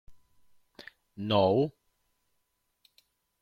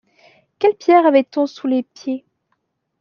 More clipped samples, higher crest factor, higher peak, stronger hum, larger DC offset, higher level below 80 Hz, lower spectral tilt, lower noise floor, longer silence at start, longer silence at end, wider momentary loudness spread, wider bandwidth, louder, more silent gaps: neither; first, 22 dB vs 16 dB; second, -12 dBFS vs -2 dBFS; neither; neither; about the same, -68 dBFS vs -72 dBFS; first, -8 dB/octave vs -5 dB/octave; first, -78 dBFS vs -70 dBFS; second, 0.1 s vs 0.6 s; first, 1.7 s vs 0.8 s; first, 26 LU vs 15 LU; first, 14 kHz vs 6.8 kHz; second, -28 LUFS vs -17 LUFS; neither